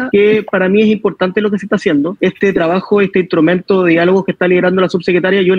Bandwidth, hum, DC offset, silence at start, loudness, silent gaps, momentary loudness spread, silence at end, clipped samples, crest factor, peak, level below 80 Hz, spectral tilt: 7.4 kHz; none; under 0.1%; 0 s; -12 LUFS; none; 4 LU; 0 s; under 0.1%; 12 dB; 0 dBFS; -52 dBFS; -7.5 dB/octave